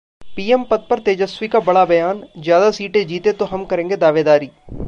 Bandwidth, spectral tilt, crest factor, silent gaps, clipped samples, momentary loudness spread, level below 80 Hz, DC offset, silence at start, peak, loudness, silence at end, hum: 7.6 kHz; -6 dB/octave; 14 dB; none; under 0.1%; 9 LU; -44 dBFS; under 0.1%; 0.2 s; -2 dBFS; -16 LUFS; 0 s; none